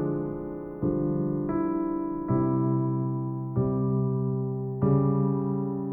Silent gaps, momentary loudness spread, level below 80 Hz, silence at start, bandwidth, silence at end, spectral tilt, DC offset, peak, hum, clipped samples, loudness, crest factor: none; 7 LU; -50 dBFS; 0 s; 2.5 kHz; 0 s; -14.5 dB/octave; under 0.1%; -12 dBFS; none; under 0.1%; -28 LUFS; 14 dB